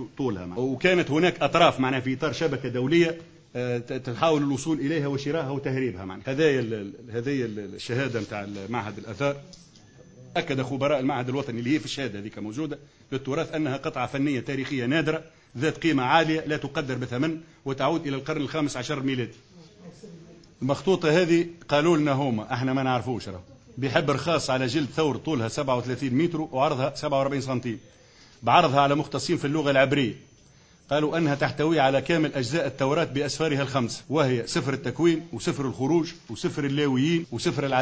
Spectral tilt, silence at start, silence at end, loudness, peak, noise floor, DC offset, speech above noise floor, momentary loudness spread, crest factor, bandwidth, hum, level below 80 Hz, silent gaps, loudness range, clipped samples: -6 dB/octave; 0 s; 0 s; -26 LUFS; -4 dBFS; -55 dBFS; under 0.1%; 30 dB; 11 LU; 22 dB; 8 kHz; none; -58 dBFS; none; 5 LU; under 0.1%